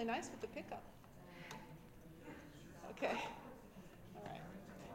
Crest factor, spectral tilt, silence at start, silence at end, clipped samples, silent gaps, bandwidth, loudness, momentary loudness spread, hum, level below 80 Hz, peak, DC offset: 22 dB; -4.5 dB/octave; 0 s; 0 s; under 0.1%; none; 16 kHz; -50 LUFS; 17 LU; none; -68 dBFS; -26 dBFS; under 0.1%